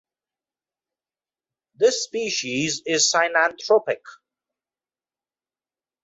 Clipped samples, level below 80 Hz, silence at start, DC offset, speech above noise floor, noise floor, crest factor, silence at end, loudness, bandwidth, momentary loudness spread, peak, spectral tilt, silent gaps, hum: under 0.1%; -72 dBFS; 1.8 s; under 0.1%; over 68 dB; under -90 dBFS; 20 dB; 1.9 s; -21 LUFS; 8 kHz; 7 LU; -4 dBFS; -1.5 dB/octave; none; none